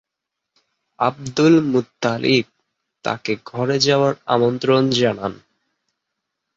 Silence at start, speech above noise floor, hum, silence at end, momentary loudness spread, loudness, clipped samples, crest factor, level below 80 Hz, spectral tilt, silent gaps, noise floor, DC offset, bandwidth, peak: 1 s; 64 dB; none; 1.2 s; 11 LU; -19 LUFS; under 0.1%; 18 dB; -58 dBFS; -5.5 dB/octave; none; -82 dBFS; under 0.1%; 7.8 kHz; -2 dBFS